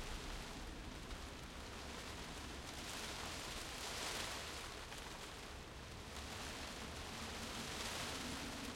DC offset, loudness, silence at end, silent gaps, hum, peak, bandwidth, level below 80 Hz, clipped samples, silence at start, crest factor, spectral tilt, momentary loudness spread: under 0.1%; -47 LUFS; 0 s; none; none; -28 dBFS; 16.5 kHz; -56 dBFS; under 0.1%; 0 s; 20 dB; -2.5 dB/octave; 7 LU